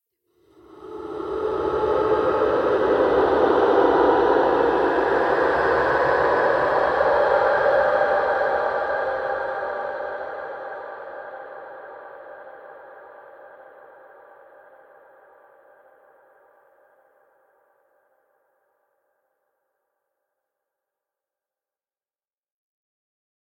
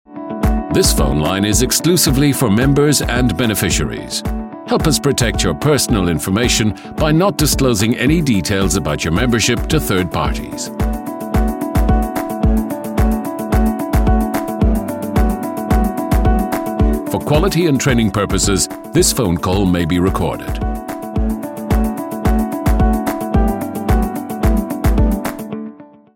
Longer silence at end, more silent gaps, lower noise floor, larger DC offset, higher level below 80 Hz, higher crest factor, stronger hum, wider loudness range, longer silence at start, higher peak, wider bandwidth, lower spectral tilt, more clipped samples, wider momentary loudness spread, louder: first, 9.9 s vs 0.3 s; neither; first, under -90 dBFS vs -35 dBFS; neither; second, -52 dBFS vs -22 dBFS; about the same, 18 dB vs 14 dB; neither; first, 19 LU vs 4 LU; first, 0.75 s vs 0.1 s; second, -6 dBFS vs 0 dBFS; second, 8.4 kHz vs 17 kHz; first, -6.5 dB/octave vs -5 dB/octave; neither; first, 21 LU vs 8 LU; second, -20 LUFS vs -16 LUFS